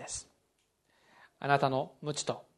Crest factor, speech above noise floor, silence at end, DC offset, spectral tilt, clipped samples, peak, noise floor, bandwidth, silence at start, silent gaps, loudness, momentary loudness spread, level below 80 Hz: 26 dB; 44 dB; 0.15 s; under 0.1%; -4 dB/octave; under 0.1%; -10 dBFS; -76 dBFS; 12 kHz; 0 s; none; -33 LUFS; 12 LU; -68 dBFS